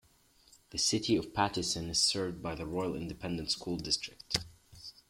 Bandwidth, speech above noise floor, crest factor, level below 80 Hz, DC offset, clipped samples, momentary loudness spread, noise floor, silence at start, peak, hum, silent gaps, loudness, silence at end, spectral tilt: 16.5 kHz; 32 dB; 26 dB; -56 dBFS; under 0.1%; under 0.1%; 11 LU; -66 dBFS; 0.7 s; -10 dBFS; none; none; -33 LUFS; 0.2 s; -3 dB/octave